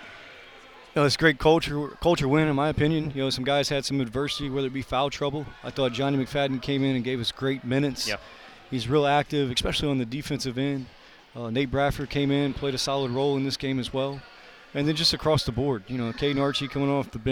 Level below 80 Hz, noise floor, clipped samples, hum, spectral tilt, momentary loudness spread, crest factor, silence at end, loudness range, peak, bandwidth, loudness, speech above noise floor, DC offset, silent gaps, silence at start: -46 dBFS; -48 dBFS; under 0.1%; none; -5.5 dB/octave; 10 LU; 22 dB; 0 s; 3 LU; -4 dBFS; 18 kHz; -26 LUFS; 23 dB; under 0.1%; none; 0 s